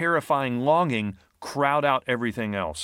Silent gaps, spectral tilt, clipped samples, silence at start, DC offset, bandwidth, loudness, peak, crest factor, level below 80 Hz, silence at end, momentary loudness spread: none; -5.5 dB/octave; under 0.1%; 0 s; under 0.1%; 16.5 kHz; -24 LUFS; -6 dBFS; 18 dB; -58 dBFS; 0 s; 10 LU